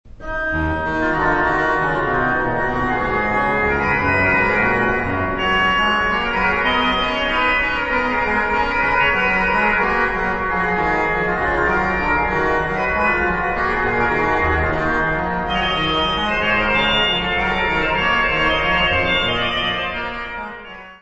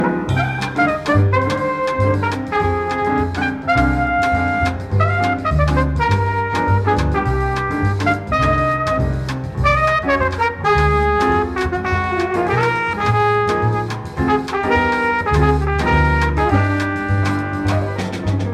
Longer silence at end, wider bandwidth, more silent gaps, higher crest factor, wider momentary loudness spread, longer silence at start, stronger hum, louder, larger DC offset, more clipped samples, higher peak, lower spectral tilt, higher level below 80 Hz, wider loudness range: about the same, 0.05 s vs 0 s; second, 8.2 kHz vs 12 kHz; neither; about the same, 14 dB vs 14 dB; about the same, 5 LU vs 4 LU; about the same, 0.05 s vs 0 s; neither; about the same, -17 LUFS vs -17 LUFS; neither; neither; about the same, -4 dBFS vs -2 dBFS; second, -5.5 dB/octave vs -7 dB/octave; second, -34 dBFS vs -28 dBFS; about the same, 2 LU vs 1 LU